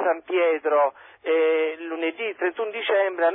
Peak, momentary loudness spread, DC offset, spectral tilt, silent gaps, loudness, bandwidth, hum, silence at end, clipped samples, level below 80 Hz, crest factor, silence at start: -8 dBFS; 7 LU; under 0.1%; -6 dB/octave; none; -23 LUFS; 4.1 kHz; none; 0 s; under 0.1%; -82 dBFS; 16 dB; 0 s